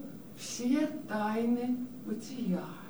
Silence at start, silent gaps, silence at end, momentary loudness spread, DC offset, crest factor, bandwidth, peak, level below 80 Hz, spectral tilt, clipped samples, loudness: 0 s; none; 0 s; 10 LU; 0.2%; 16 dB; over 20 kHz; -18 dBFS; -74 dBFS; -5.5 dB/octave; under 0.1%; -34 LUFS